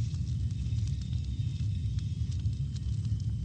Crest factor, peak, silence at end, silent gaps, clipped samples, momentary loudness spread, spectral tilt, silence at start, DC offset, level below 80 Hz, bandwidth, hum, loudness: 10 dB; -20 dBFS; 0 s; none; under 0.1%; 2 LU; -7 dB/octave; 0 s; under 0.1%; -38 dBFS; 8.8 kHz; none; -34 LUFS